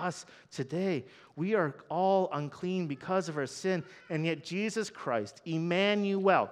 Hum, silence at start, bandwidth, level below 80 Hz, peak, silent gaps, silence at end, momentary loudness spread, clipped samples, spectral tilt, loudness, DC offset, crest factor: none; 0 s; 11.5 kHz; -80 dBFS; -12 dBFS; none; 0 s; 10 LU; under 0.1%; -5.5 dB/octave; -32 LUFS; under 0.1%; 20 dB